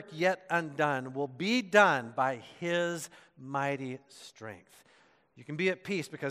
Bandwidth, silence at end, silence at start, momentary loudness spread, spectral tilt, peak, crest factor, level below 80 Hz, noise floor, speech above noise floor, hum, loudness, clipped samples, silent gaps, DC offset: 14 kHz; 0 s; 0 s; 21 LU; -4.5 dB/octave; -8 dBFS; 24 dB; -82 dBFS; -65 dBFS; 33 dB; none; -30 LUFS; under 0.1%; none; under 0.1%